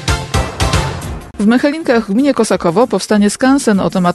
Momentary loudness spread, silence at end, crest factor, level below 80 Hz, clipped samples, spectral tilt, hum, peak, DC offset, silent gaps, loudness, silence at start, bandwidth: 6 LU; 0 s; 12 dB; -28 dBFS; under 0.1%; -5.5 dB/octave; none; 0 dBFS; under 0.1%; none; -13 LUFS; 0 s; 12.5 kHz